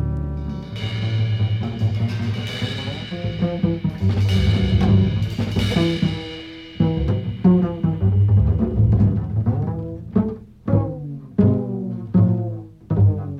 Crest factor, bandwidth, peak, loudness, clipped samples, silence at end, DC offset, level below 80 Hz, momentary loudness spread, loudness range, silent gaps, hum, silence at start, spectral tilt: 14 dB; 7.8 kHz; -4 dBFS; -21 LUFS; under 0.1%; 0 s; under 0.1%; -32 dBFS; 11 LU; 4 LU; none; none; 0 s; -8 dB/octave